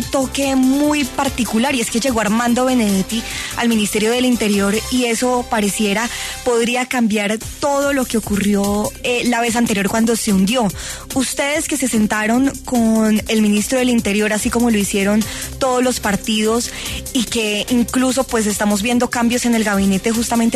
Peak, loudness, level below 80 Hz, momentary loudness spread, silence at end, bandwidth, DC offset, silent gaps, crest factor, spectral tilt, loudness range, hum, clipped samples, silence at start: -4 dBFS; -17 LUFS; -38 dBFS; 4 LU; 0 s; 14 kHz; under 0.1%; none; 12 dB; -4 dB/octave; 2 LU; none; under 0.1%; 0 s